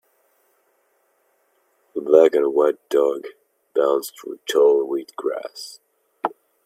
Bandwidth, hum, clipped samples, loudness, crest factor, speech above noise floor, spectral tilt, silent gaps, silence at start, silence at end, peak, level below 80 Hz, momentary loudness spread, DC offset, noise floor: 15 kHz; none; under 0.1%; -20 LUFS; 22 dB; 46 dB; -3.5 dB/octave; none; 1.95 s; 0.35 s; 0 dBFS; -78 dBFS; 18 LU; under 0.1%; -65 dBFS